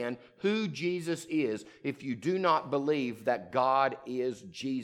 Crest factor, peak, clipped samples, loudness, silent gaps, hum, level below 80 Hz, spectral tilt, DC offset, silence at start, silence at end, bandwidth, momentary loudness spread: 18 dB; -14 dBFS; under 0.1%; -31 LUFS; none; none; -76 dBFS; -5.5 dB/octave; under 0.1%; 0 s; 0 s; 15.5 kHz; 9 LU